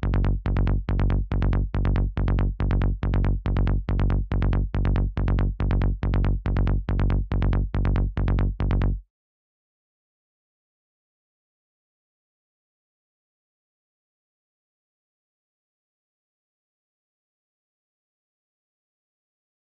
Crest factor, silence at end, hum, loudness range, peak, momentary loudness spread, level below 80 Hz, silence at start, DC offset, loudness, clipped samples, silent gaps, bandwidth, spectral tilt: 16 dB; 10.75 s; none; 5 LU; -8 dBFS; 1 LU; -28 dBFS; 0 s; under 0.1%; -25 LUFS; under 0.1%; none; 4.8 kHz; -10 dB/octave